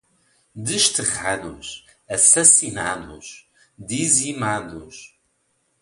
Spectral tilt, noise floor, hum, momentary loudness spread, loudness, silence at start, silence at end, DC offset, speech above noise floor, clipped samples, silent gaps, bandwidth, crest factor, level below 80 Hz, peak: -1.5 dB/octave; -68 dBFS; none; 26 LU; -17 LUFS; 0.55 s; 0.75 s; under 0.1%; 47 dB; under 0.1%; none; 13.5 kHz; 22 dB; -54 dBFS; 0 dBFS